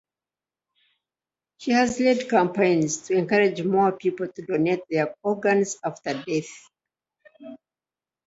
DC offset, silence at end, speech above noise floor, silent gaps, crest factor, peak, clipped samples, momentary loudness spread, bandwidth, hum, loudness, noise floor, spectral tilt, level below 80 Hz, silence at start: under 0.1%; 0.7 s; over 67 dB; none; 18 dB; -6 dBFS; under 0.1%; 12 LU; 8 kHz; none; -23 LUFS; under -90 dBFS; -5 dB/octave; -66 dBFS; 1.6 s